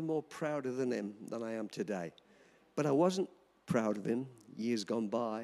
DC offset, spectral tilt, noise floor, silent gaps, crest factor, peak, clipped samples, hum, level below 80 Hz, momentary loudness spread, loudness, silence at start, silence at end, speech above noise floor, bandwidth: under 0.1%; -6 dB/octave; -57 dBFS; none; 18 dB; -18 dBFS; under 0.1%; none; -78 dBFS; 11 LU; -36 LUFS; 0 s; 0 s; 21 dB; 13.5 kHz